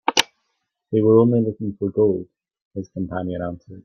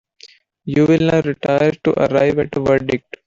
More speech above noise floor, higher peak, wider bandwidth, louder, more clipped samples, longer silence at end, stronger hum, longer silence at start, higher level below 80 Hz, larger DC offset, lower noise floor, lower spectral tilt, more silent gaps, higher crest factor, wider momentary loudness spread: first, 55 dB vs 31 dB; about the same, 0 dBFS vs -2 dBFS; first, 14.5 kHz vs 7.6 kHz; second, -21 LUFS vs -16 LUFS; neither; second, 0.05 s vs 0.25 s; neither; second, 0.05 s vs 0.65 s; second, -58 dBFS vs -48 dBFS; neither; first, -75 dBFS vs -47 dBFS; second, -5 dB/octave vs -7.5 dB/octave; first, 2.65-2.71 s vs none; first, 20 dB vs 14 dB; first, 17 LU vs 6 LU